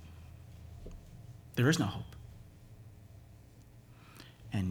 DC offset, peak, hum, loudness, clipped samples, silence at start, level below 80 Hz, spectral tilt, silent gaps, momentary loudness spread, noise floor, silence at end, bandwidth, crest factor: under 0.1%; -14 dBFS; none; -33 LUFS; under 0.1%; 0 s; -56 dBFS; -5.5 dB/octave; none; 27 LU; -56 dBFS; 0 s; 19.5 kHz; 24 dB